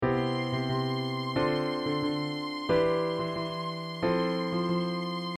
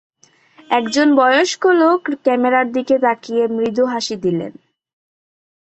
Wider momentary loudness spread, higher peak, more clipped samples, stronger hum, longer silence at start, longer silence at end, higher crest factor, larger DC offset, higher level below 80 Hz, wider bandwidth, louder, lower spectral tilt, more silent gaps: about the same, 6 LU vs 8 LU; second, -14 dBFS vs -2 dBFS; neither; neither; second, 0 s vs 0.7 s; second, 0 s vs 1.15 s; about the same, 16 dB vs 16 dB; neither; first, -56 dBFS vs -64 dBFS; first, 13.5 kHz vs 8.4 kHz; second, -30 LUFS vs -16 LUFS; first, -7 dB/octave vs -4 dB/octave; neither